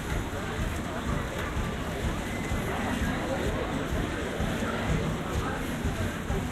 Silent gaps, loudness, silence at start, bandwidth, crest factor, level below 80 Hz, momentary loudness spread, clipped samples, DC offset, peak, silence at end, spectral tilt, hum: none; -31 LUFS; 0 s; 15.5 kHz; 14 dB; -36 dBFS; 3 LU; under 0.1%; under 0.1%; -16 dBFS; 0 s; -5.5 dB/octave; none